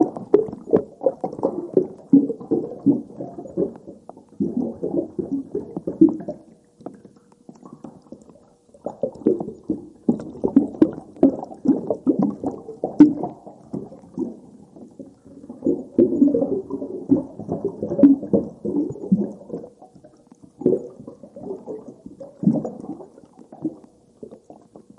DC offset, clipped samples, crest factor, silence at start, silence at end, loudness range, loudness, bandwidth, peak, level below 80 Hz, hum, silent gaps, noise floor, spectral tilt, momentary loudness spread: under 0.1%; under 0.1%; 22 dB; 0 s; 0.2 s; 9 LU; -22 LUFS; 2.8 kHz; 0 dBFS; -60 dBFS; none; none; -52 dBFS; -10.5 dB/octave; 23 LU